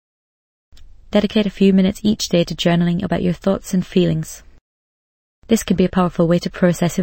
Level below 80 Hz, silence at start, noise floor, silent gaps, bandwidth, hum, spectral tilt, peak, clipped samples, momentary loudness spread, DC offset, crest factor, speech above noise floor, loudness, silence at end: -42 dBFS; 0.8 s; under -90 dBFS; 4.61-5.42 s; 16.5 kHz; none; -6 dB/octave; 0 dBFS; under 0.1%; 5 LU; under 0.1%; 18 dB; over 73 dB; -18 LUFS; 0 s